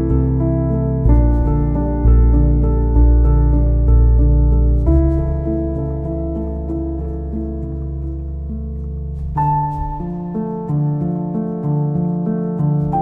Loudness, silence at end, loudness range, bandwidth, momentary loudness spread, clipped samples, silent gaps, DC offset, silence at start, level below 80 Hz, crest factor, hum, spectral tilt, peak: -18 LUFS; 0 s; 9 LU; 2.2 kHz; 11 LU; under 0.1%; none; under 0.1%; 0 s; -18 dBFS; 14 dB; none; -13 dB/octave; -2 dBFS